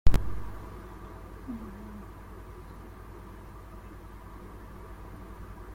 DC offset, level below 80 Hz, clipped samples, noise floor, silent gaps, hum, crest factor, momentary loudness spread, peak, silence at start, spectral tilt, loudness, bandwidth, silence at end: under 0.1%; -38 dBFS; under 0.1%; -45 dBFS; none; none; 24 dB; 6 LU; -6 dBFS; 0.05 s; -7 dB/octave; -43 LUFS; 14.5 kHz; 0 s